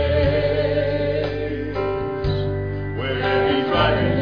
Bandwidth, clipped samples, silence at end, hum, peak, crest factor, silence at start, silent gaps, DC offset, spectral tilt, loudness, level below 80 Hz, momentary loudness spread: 5.4 kHz; under 0.1%; 0 s; none; -6 dBFS; 14 dB; 0 s; none; 0.4%; -8.5 dB/octave; -21 LUFS; -34 dBFS; 7 LU